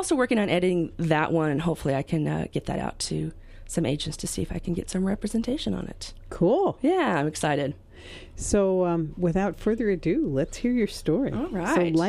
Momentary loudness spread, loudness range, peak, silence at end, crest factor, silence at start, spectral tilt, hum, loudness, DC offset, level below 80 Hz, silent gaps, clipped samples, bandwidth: 9 LU; 4 LU; -6 dBFS; 0 s; 20 dB; 0 s; -5.5 dB/octave; none; -26 LUFS; under 0.1%; -44 dBFS; none; under 0.1%; 13.5 kHz